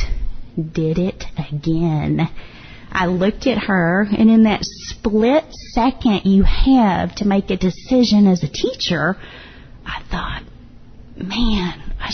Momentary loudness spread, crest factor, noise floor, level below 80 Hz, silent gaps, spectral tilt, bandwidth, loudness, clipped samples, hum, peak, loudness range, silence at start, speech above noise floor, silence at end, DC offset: 15 LU; 14 dB; -39 dBFS; -28 dBFS; none; -6.5 dB/octave; 6.6 kHz; -18 LUFS; under 0.1%; none; -4 dBFS; 6 LU; 0 s; 23 dB; 0 s; under 0.1%